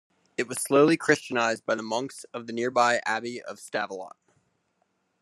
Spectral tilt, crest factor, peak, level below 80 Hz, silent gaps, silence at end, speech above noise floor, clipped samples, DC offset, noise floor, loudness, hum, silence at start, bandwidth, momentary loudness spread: -4 dB/octave; 22 dB; -6 dBFS; -78 dBFS; none; 1.15 s; 47 dB; under 0.1%; under 0.1%; -73 dBFS; -26 LUFS; none; 0.4 s; 13 kHz; 16 LU